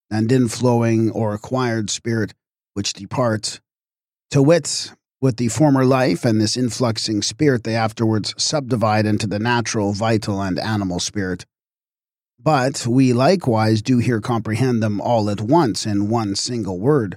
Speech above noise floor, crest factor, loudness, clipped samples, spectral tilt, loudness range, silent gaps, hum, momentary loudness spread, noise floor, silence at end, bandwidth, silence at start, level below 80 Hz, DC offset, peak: over 72 dB; 16 dB; -19 LUFS; under 0.1%; -5.5 dB/octave; 4 LU; none; none; 8 LU; under -90 dBFS; 0 s; 15 kHz; 0.1 s; -56 dBFS; under 0.1%; -4 dBFS